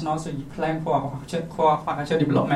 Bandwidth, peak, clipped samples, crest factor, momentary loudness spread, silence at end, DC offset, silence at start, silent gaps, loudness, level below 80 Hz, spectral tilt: 13 kHz; -8 dBFS; under 0.1%; 16 dB; 9 LU; 0 s; under 0.1%; 0 s; none; -25 LUFS; -50 dBFS; -7 dB/octave